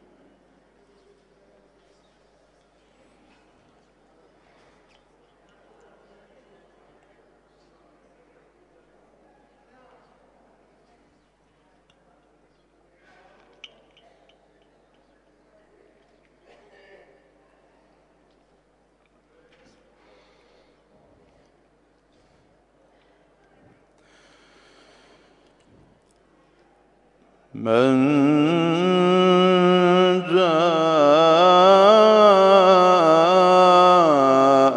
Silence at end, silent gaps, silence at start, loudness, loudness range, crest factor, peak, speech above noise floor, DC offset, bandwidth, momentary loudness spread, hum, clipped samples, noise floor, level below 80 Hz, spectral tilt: 0 s; none; 27.55 s; -15 LUFS; 10 LU; 20 dB; -2 dBFS; 45 dB; under 0.1%; 10 kHz; 6 LU; 50 Hz at -60 dBFS; under 0.1%; -62 dBFS; -70 dBFS; -6 dB/octave